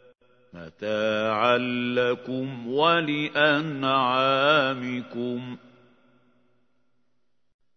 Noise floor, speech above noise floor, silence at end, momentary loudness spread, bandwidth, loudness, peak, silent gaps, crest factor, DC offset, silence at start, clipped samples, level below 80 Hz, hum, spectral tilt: -78 dBFS; 54 dB; 2.2 s; 13 LU; 6.6 kHz; -24 LUFS; -6 dBFS; none; 20 dB; under 0.1%; 0.55 s; under 0.1%; -72 dBFS; none; -6 dB/octave